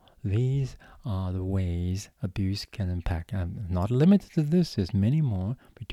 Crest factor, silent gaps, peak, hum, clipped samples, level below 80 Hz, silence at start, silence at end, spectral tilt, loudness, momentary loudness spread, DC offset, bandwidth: 16 dB; none; -10 dBFS; none; under 0.1%; -44 dBFS; 0.25 s; 0 s; -8 dB/octave; -28 LUFS; 11 LU; under 0.1%; 13 kHz